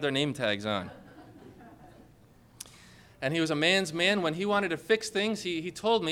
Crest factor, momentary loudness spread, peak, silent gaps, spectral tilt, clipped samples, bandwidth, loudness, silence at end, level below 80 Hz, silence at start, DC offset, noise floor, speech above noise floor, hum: 20 dB; 19 LU; -12 dBFS; none; -4 dB/octave; under 0.1%; 16.5 kHz; -28 LUFS; 0 s; -66 dBFS; 0 s; under 0.1%; -58 dBFS; 29 dB; none